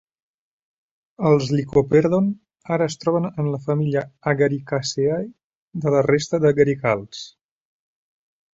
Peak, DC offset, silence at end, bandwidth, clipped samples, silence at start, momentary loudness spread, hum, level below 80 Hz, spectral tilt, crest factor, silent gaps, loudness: -2 dBFS; under 0.1%; 1.25 s; 7.8 kHz; under 0.1%; 1.2 s; 10 LU; none; -56 dBFS; -6.5 dB/octave; 18 dB; 5.44-5.71 s; -21 LUFS